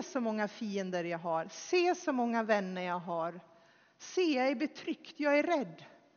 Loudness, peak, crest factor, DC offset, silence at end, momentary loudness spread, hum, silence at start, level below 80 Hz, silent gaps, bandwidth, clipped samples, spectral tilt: -33 LUFS; -14 dBFS; 20 dB; under 0.1%; 0.25 s; 10 LU; none; 0 s; -90 dBFS; none; 6.8 kHz; under 0.1%; -3.5 dB/octave